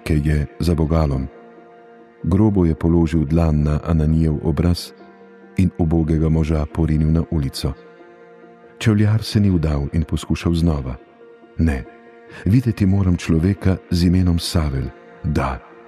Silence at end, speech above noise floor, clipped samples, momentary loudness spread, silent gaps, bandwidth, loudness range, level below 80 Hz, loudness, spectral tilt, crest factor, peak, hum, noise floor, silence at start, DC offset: 0.25 s; 27 dB; under 0.1%; 10 LU; none; 13.5 kHz; 3 LU; -28 dBFS; -19 LUFS; -7.5 dB/octave; 14 dB; -4 dBFS; none; -45 dBFS; 0.05 s; under 0.1%